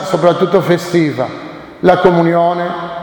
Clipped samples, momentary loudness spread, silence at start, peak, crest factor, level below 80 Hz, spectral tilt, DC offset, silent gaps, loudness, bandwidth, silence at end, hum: 0.2%; 11 LU; 0 s; 0 dBFS; 12 dB; -48 dBFS; -7 dB/octave; under 0.1%; none; -13 LUFS; 19 kHz; 0 s; none